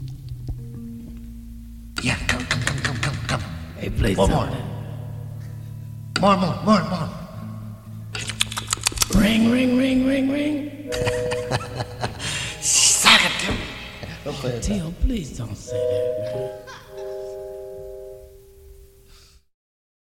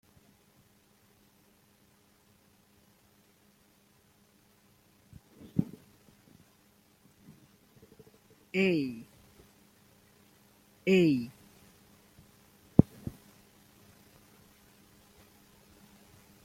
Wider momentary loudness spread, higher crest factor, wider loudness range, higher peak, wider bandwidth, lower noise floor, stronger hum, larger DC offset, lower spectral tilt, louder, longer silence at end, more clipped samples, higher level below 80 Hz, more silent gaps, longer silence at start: second, 18 LU vs 28 LU; second, 24 dB vs 34 dB; about the same, 11 LU vs 13 LU; about the same, 0 dBFS vs -2 dBFS; about the same, 17 kHz vs 16.5 kHz; second, -50 dBFS vs -65 dBFS; neither; neither; second, -3.5 dB/octave vs -7.5 dB/octave; first, -21 LUFS vs -30 LUFS; second, 1 s vs 3.35 s; neither; first, -36 dBFS vs -60 dBFS; neither; second, 0 s vs 5.55 s